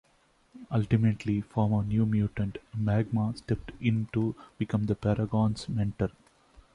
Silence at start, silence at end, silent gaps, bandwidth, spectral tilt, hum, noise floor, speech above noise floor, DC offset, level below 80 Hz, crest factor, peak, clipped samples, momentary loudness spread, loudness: 0.55 s; 0.65 s; none; 10 kHz; -8.5 dB/octave; none; -66 dBFS; 38 dB; under 0.1%; -50 dBFS; 18 dB; -12 dBFS; under 0.1%; 7 LU; -29 LUFS